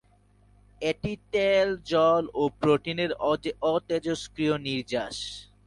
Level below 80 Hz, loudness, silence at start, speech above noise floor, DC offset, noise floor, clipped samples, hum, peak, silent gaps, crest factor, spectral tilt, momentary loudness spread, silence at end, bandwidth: -56 dBFS; -27 LUFS; 0.8 s; 34 dB; under 0.1%; -60 dBFS; under 0.1%; 50 Hz at -55 dBFS; -10 dBFS; none; 18 dB; -5.5 dB/octave; 9 LU; 0.25 s; 11.5 kHz